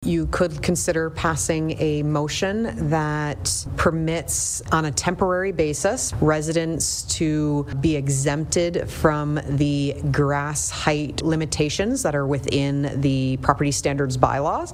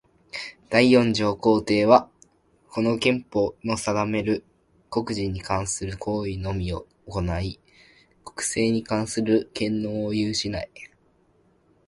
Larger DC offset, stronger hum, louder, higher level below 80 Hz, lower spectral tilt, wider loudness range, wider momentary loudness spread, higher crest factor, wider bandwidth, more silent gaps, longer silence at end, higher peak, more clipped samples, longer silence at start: neither; neither; about the same, -22 LUFS vs -24 LUFS; first, -38 dBFS vs -46 dBFS; about the same, -4.5 dB/octave vs -5 dB/octave; second, 1 LU vs 7 LU; second, 3 LU vs 16 LU; about the same, 20 dB vs 24 dB; first, 16 kHz vs 11.5 kHz; neither; second, 0 s vs 1 s; about the same, -2 dBFS vs -2 dBFS; neither; second, 0 s vs 0.35 s